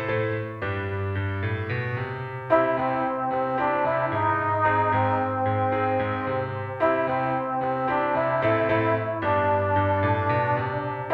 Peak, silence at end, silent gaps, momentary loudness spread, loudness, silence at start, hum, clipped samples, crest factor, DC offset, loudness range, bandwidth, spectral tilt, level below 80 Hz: -6 dBFS; 0 s; none; 7 LU; -25 LUFS; 0 s; none; under 0.1%; 18 dB; under 0.1%; 2 LU; 5.2 kHz; -9 dB/octave; -56 dBFS